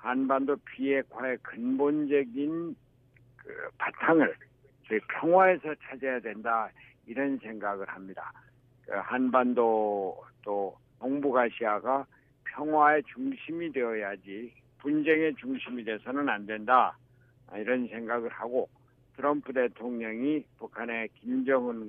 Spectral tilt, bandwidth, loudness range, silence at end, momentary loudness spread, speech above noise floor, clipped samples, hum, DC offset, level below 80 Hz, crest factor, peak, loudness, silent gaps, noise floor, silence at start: -9 dB/octave; 3.8 kHz; 4 LU; 0 s; 16 LU; 32 dB; under 0.1%; none; under 0.1%; -72 dBFS; 22 dB; -8 dBFS; -29 LUFS; none; -61 dBFS; 0 s